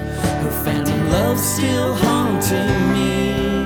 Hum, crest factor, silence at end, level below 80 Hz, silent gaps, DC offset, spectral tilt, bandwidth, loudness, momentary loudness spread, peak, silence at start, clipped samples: none; 16 dB; 0 s; -34 dBFS; none; under 0.1%; -5 dB/octave; over 20 kHz; -18 LUFS; 3 LU; -2 dBFS; 0 s; under 0.1%